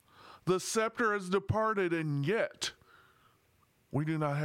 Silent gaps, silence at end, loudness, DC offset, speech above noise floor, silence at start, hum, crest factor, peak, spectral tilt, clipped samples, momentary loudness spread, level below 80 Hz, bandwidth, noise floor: none; 0 s; -32 LUFS; under 0.1%; 38 dB; 0.2 s; none; 18 dB; -16 dBFS; -5 dB/octave; under 0.1%; 8 LU; -64 dBFS; 16.5 kHz; -70 dBFS